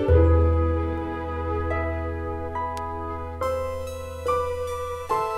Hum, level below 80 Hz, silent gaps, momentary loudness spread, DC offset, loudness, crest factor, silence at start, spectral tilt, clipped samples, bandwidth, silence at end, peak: none; -30 dBFS; none; 11 LU; under 0.1%; -26 LUFS; 18 dB; 0 s; -7.5 dB/octave; under 0.1%; 13 kHz; 0 s; -6 dBFS